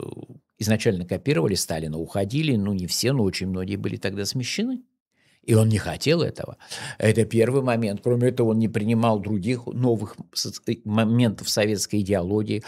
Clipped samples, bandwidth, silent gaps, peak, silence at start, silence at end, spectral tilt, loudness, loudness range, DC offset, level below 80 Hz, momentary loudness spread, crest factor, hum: under 0.1%; 15.5 kHz; 5.00-5.06 s; -4 dBFS; 0 s; 0 s; -5.5 dB/octave; -23 LUFS; 3 LU; under 0.1%; -54 dBFS; 8 LU; 18 dB; none